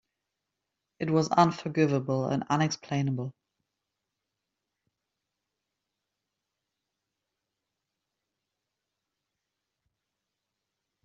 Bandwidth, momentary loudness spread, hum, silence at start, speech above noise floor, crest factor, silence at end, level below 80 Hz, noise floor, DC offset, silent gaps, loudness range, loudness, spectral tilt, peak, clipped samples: 7.8 kHz; 10 LU; none; 1 s; 59 dB; 26 dB; 7.75 s; -72 dBFS; -86 dBFS; under 0.1%; none; 11 LU; -28 LUFS; -6 dB/octave; -8 dBFS; under 0.1%